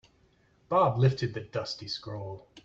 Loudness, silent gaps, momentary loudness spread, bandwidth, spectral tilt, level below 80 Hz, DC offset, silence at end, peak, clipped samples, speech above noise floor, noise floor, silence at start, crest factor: -29 LUFS; none; 15 LU; 7.6 kHz; -7 dB/octave; -62 dBFS; under 0.1%; 0.05 s; -12 dBFS; under 0.1%; 36 dB; -65 dBFS; 0.7 s; 18 dB